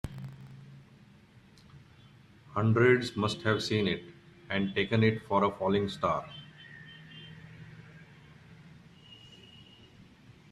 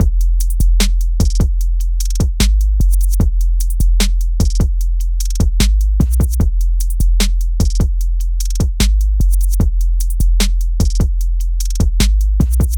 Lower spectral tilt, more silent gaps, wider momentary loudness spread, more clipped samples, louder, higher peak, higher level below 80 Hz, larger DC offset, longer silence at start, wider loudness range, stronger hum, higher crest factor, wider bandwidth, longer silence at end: first, -6.5 dB/octave vs -5 dB/octave; neither; first, 26 LU vs 5 LU; neither; second, -29 LUFS vs -17 LUFS; second, -10 dBFS vs 0 dBFS; second, -62 dBFS vs -12 dBFS; neither; about the same, 0.05 s vs 0 s; first, 22 LU vs 1 LU; neither; first, 22 dB vs 12 dB; second, 12 kHz vs 19 kHz; first, 1.25 s vs 0 s